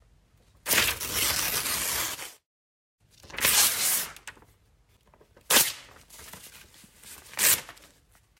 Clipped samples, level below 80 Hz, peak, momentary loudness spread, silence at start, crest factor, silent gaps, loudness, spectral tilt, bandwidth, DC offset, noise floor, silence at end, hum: under 0.1%; -56 dBFS; -6 dBFS; 24 LU; 0.65 s; 24 dB; 2.46-2.98 s; -24 LUFS; 0.5 dB/octave; 16 kHz; under 0.1%; -63 dBFS; 0.65 s; none